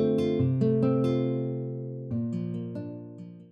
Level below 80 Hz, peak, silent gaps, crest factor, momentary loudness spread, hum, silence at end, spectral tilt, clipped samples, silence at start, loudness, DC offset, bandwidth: -66 dBFS; -14 dBFS; none; 14 dB; 15 LU; none; 0.05 s; -10 dB/octave; under 0.1%; 0 s; -28 LUFS; under 0.1%; 6.4 kHz